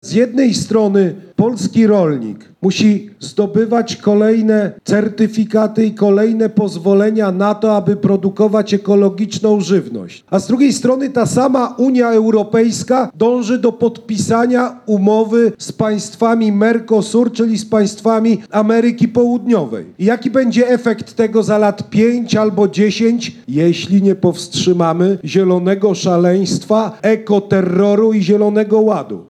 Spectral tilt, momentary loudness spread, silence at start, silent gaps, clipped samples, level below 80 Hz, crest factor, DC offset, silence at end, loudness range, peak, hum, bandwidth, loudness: -6.5 dB/octave; 5 LU; 0.05 s; none; under 0.1%; -60 dBFS; 12 dB; under 0.1%; 0.1 s; 1 LU; -2 dBFS; none; 11.5 kHz; -14 LUFS